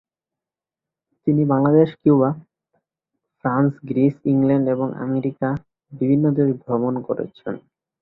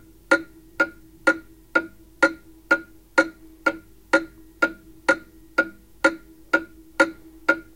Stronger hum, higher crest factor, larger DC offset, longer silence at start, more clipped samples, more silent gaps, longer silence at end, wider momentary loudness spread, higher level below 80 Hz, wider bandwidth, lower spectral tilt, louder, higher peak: neither; second, 18 dB vs 24 dB; neither; first, 1.25 s vs 0.3 s; neither; neither; first, 0.45 s vs 0.15 s; first, 12 LU vs 8 LU; about the same, -58 dBFS vs -56 dBFS; second, 4.1 kHz vs 17 kHz; first, -12 dB/octave vs -3 dB/octave; first, -20 LUFS vs -24 LUFS; about the same, -4 dBFS vs -2 dBFS